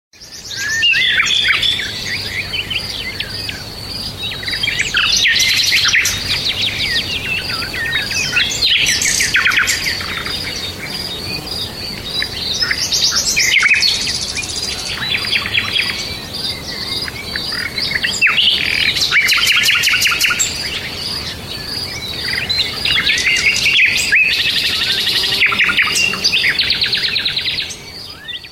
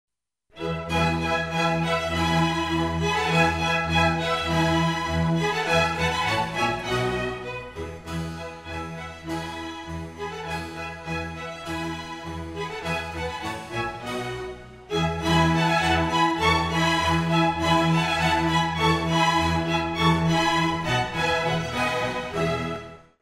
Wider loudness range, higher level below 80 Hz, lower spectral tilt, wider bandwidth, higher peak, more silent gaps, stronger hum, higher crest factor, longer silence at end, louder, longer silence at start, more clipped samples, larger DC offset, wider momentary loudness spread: second, 6 LU vs 11 LU; about the same, -40 dBFS vs -42 dBFS; second, -0.5 dB/octave vs -5 dB/octave; about the same, 16.5 kHz vs 15 kHz; first, -2 dBFS vs -8 dBFS; neither; neither; about the same, 16 dB vs 18 dB; second, 0 s vs 0.2 s; first, -14 LUFS vs -24 LUFS; second, 0.2 s vs 0.55 s; neither; neither; about the same, 11 LU vs 13 LU